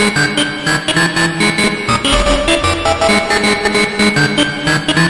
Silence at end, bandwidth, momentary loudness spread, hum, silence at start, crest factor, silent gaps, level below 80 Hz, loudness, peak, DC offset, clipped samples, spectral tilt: 0 s; 11.5 kHz; 3 LU; none; 0 s; 14 dB; none; -28 dBFS; -12 LUFS; 0 dBFS; under 0.1%; under 0.1%; -3.5 dB/octave